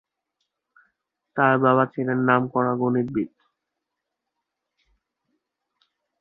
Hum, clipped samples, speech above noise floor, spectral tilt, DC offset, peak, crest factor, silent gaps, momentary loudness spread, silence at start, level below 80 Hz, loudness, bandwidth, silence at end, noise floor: none; under 0.1%; 62 dB; -10.5 dB/octave; under 0.1%; -2 dBFS; 24 dB; none; 10 LU; 1.35 s; -66 dBFS; -22 LUFS; 3.9 kHz; 2.95 s; -83 dBFS